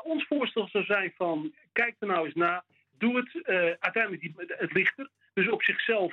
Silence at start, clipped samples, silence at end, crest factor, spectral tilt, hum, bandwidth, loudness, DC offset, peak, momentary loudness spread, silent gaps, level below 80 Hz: 0.05 s; under 0.1%; 0 s; 20 dB; -7 dB/octave; none; 6.6 kHz; -28 LUFS; under 0.1%; -10 dBFS; 9 LU; none; -82 dBFS